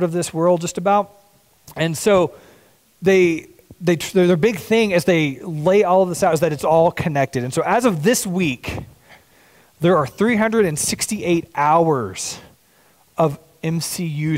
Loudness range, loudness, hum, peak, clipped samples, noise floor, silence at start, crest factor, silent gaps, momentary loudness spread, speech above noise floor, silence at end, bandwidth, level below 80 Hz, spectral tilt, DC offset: 3 LU; -18 LUFS; none; -6 dBFS; under 0.1%; -55 dBFS; 0 s; 14 dB; none; 9 LU; 38 dB; 0 s; 16 kHz; -52 dBFS; -5 dB/octave; under 0.1%